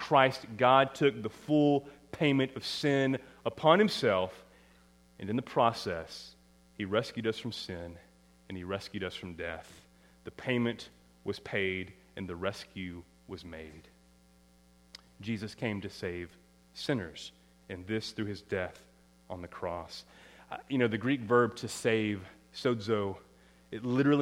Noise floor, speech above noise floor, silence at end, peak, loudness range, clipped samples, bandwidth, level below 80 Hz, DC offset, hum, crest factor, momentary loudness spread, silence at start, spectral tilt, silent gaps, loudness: -62 dBFS; 31 dB; 0 s; -8 dBFS; 12 LU; under 0.1%; 15.5 kHz; -64 dBFS; under 0.1%; none; 24 dB; 20 LU; 0 s; -5.5 dB/octave; none; -32 LUFS